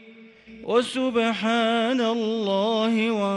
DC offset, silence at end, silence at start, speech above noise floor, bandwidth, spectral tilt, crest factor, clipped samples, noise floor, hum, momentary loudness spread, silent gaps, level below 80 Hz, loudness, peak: under 0.1%; 0 s; 0.05 s; 25 dB; 11.5 kHz; -5 dB/octave; 16 dB; under 0.1%; -48 dBFS; none; 3 LU; none; -68 dBFS; -23 LUFS; -8 dBFS